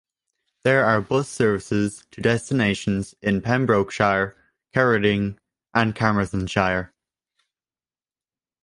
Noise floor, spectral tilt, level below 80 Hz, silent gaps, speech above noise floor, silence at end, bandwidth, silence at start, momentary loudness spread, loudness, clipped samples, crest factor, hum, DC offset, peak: under -90 dBFS; -6 dB/octave; -48 dBFS; none; over 69 dB; 1.75 s; 11.5 kHz; 0.65 s; 7 LU; -22 LUFS; under 0.1%; 22 dB; none; under 0.1%; -2 dBFS